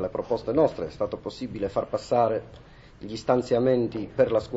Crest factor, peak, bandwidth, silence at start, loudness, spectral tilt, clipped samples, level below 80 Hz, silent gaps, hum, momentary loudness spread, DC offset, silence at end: 18 dB; -8 dBFS; 8 kHz; 0 s; -26 LUFS; -7 dB/octave; under 0.1%; -52 dBFS; none; none; 10 LU; under 0.1%; 0 s